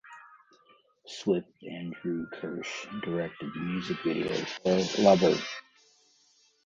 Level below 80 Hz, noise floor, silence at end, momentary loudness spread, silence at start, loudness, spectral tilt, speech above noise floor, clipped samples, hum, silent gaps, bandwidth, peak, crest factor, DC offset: -66 dBFS; -66 dBFS; 1.05 s; 17 LU; 0.05 s; -29 LUFS; -5.5 dB/octave; 37 dB; under 0.1%; none; none; 7.8 kHz; -8 dBFS; 22 dB; under 0.1%